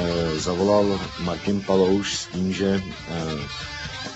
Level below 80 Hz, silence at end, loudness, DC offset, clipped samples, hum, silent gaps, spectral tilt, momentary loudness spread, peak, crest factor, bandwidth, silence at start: -44 dBFS; 0 s; -24 LUFS; under 0.1%; under 0.1%; none; none; -5 dB/octave; 11 LU; -6 dBFS; 16 dB; 8.2 kHz; 0 s